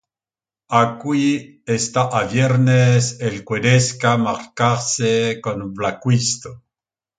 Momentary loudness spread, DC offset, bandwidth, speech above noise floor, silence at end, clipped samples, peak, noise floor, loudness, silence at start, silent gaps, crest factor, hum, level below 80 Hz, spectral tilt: 9 LU; under 0.1%; 9.4 kHz; over 72 dB; 0.65 s; under 0.1%; 0 dBFS; under -90 dBFS; -18 LUFS; 0.7 s; none; 18 dB; none; -54 dBFS; -5 dB/octave